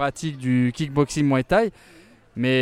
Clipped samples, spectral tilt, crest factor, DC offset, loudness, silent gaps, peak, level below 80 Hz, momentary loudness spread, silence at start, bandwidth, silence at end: under 0.1%; -6 dB/octave; 18 dB; under 0.1%; -22 LUFS; none; -4 dBFS; -48 dBFS; 8 LU; 0 s; 13 kHz; 0 s